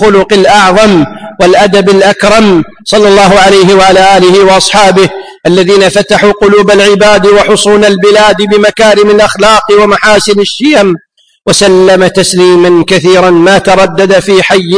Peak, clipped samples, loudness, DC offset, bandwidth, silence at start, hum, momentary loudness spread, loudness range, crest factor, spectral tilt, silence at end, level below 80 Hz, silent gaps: 0 dBFS; 7%; -4 LUFS; under 0.1%; 11 kHz; 0 s; none; 5 LU; 2 LU; 4 dB; -4 dB/octave; 0 s; -32 dBFS; none